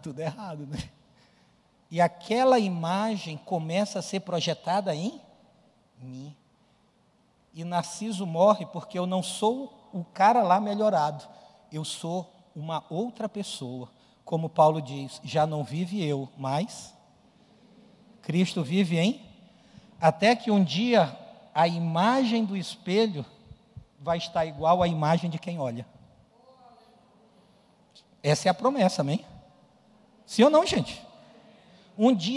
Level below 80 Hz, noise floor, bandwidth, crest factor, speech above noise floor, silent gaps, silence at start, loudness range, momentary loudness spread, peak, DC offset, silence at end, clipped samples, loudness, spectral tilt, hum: -64 dBFS; -65 dBFS; 12 kHz; 20 dB; 39 dB; none; 0.05 s; 8 LU; 17 LU; -8 dBFS; under 0.1%; 0 s; under 0.1%; -26 LUFS; -5.5 dB/octave; none